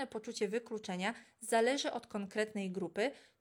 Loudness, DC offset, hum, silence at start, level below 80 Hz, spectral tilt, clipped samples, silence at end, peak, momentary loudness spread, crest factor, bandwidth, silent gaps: -37 LUFS; under 0.1%; none; 0 s; -84 dBFS; -4 dB/octave; under 0.1%; 0.2 s; -18 dBFS; 10 LU; 18 dB; 18 kHz; none